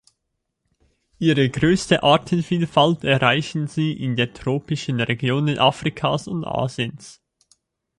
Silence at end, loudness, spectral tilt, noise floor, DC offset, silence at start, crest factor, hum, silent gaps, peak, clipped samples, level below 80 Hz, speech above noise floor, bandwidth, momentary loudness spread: 0.85 s; -20 LUFS; -5.5 dB/octave; -77 dBFS; under 0.1%; 1.2 s; 20 dB; none; none; -2 dBFS; under 0.1%; -52 dBFS; 57 dB; 11.5 kHz; 8 LU